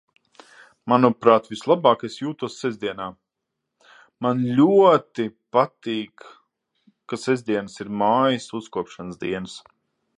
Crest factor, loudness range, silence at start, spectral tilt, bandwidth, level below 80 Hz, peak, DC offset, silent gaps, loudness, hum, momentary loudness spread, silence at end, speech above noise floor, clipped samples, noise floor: 22 dB; 4 LU; 0.85 s; -6.5 dB/octave; 11 kHz; -66 dBFS; 0 dBFS; under 0.1%; none; -21 LUFS; none; 16 LU; 0.6 s; 60 dB; under 0.1%; -81 dBFS